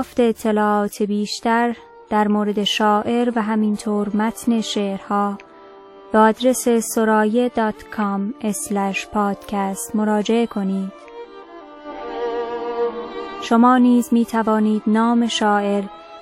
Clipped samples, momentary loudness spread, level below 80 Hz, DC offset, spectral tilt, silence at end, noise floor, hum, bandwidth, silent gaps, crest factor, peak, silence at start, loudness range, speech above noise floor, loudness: under 0.1%; 14 LU; -56 dBFS; under 0.1%; -5 dB/octave; 0 s; -42 dBFS; none; 15 kHz; none; 18 dB; -2 dBFS; 0 s; 6 LU; 24 dB; -19 LUFS